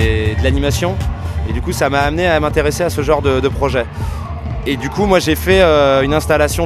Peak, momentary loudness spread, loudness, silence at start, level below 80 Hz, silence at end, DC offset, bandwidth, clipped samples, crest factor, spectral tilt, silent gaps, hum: 0 dBFS; 11 LU; -15 LUFS; 0 s; -24 dBFS; 0 s; under 0.1%; 14.5 kHz; under 0.1%; 14 dB; -5.5 dB/octave; none; none